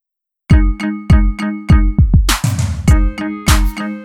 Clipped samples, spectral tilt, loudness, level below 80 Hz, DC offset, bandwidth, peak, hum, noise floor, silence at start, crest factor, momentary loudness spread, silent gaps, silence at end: under 0.1%; -5.5 dB/octave; -14 LUFS; -14 dBFS; under 0.1%; 16.5 kHz; 0 dBFS; none; -43 dBFS; 0.5 s; 12 dB; 7 LU; none; 0 s